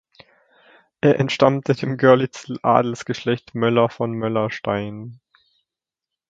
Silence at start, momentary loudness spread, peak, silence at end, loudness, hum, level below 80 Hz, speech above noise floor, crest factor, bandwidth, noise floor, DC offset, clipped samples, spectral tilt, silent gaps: 1.05 s; 10 LU; 0 dBFS; 1.15 s; -20 LUFS; none; -58 dBFS; 67 dB; 20 dB; 7.8 kHz; -86 dBFS; under 0.1%; under 0.1%; -6.5 dB/octave; none